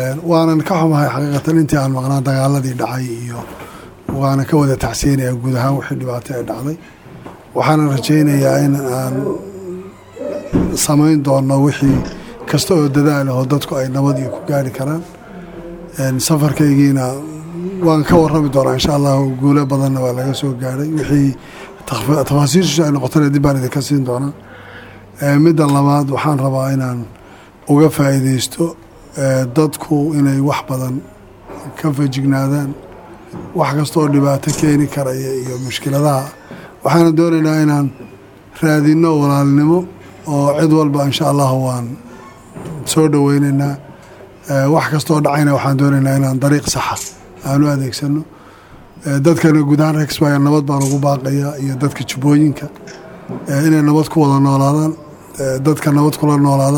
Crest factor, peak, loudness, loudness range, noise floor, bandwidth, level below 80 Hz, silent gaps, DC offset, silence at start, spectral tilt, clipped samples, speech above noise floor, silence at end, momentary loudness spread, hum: 14 dB; 0 dBFS; -14 LUFS; 3 LU; -40 dBFS; 18 kHz; -42 dBFS; none; under 0.1%; 0 s; -6.5 dB/octave; under 0.1%; 26 dB; 0 s; 17 LU; none